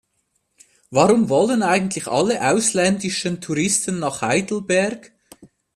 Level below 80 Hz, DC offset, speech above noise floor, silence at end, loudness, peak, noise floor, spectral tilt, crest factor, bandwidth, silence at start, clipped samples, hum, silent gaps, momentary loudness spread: -58 dBFS; under 0.1%; 51 dB; 0.3 s; -19 LUFS; 0 dBFS; -70 dBFS; -4 dB/octave; 20 dB; 14.5 kHz; 0.9 s; under 0.1%; none; none; 8 LU